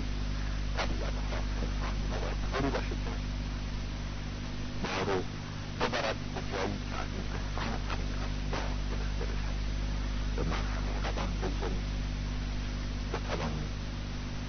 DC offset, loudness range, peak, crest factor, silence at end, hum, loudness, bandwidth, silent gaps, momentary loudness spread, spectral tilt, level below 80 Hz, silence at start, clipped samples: under 0.1%; 1 LU; -14 dBFS; 20 dB; 0 s; 50 Hz at -35 dBFS; -35 LUFS; 6.4 kHz; none; 5 LU; -4.5 dB/octave; -36 dBFS; 0 s; under 0.1%